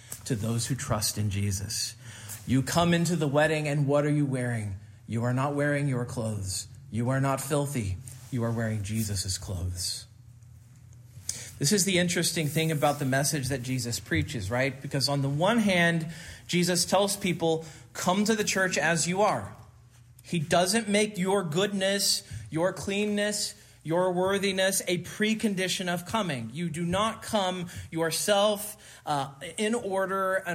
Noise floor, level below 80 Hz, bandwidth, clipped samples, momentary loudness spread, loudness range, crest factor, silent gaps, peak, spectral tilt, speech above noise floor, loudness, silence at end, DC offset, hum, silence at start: -54 dBFS; -60 dBFS; 16 kHz; under 0.1%; 10 LU; 4 LU; 18 dB; none; -10 dBFS; -4 dB/octave; 26 dB; -28 LUFS; 0 s; under 0.1%; none; 0 s